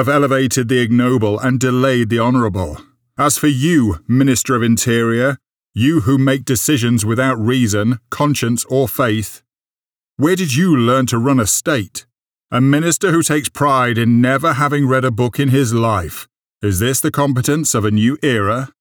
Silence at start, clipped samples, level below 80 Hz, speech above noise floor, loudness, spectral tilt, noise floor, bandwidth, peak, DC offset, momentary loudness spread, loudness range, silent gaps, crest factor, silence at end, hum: 0 s; under 0.1%; -46 dBFS; over 76 dB; -15 LUFS; -5 dB/octave; under -90 dBFS; over 20 kHz; -4 dBFS; under 0.1%; 6 LU; 2 LU; none; 12 dB; 0.15 s; none